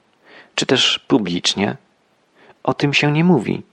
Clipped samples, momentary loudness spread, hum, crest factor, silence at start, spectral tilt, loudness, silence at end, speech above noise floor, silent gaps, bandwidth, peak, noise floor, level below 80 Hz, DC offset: under 0.1%; 10 LU; none; 16 dB; 0.55 s; -4.5 dB/octave; -17 LUFS; 0.1 s; 43 dB; none; 11 kHz; -2 dBFS; -60 dBFS; -60 dBFS; under 0.1%